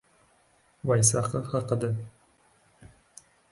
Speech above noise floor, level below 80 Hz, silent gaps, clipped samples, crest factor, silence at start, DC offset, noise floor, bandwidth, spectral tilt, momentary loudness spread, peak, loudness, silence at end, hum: 38 dB; -58 dBFS; none; under 0.1%; 24 dB; 0.85 s; under 0.1%; -64 dBFS; 11.5 kHz; -5 dB/octave; 14 LU; -6 dBFS; -27 LUFS; 0.65 s; none